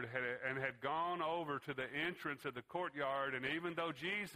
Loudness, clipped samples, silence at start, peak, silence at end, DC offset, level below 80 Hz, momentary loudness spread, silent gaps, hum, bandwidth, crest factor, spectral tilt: -41 LUFS; under 0.1%; 0 s; -24 dBFS; 0 s; under 0.1%; -78 dBFS; 5 LU; none; none; 15.5 kHz; 18 dB; -5.5 dB/octave